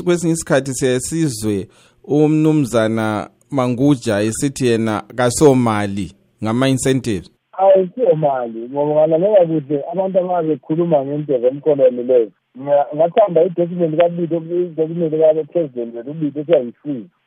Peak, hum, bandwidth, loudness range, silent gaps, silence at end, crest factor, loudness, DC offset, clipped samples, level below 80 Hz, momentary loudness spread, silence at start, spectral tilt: 0 dBFS; none; 16 kHz; 2 LU; none; 0.2 s; 16 dB; -17 LUFS; under 0.1%; under 0.1%; -52 dBFS; 11 LU; 0 s; -6 dB/octave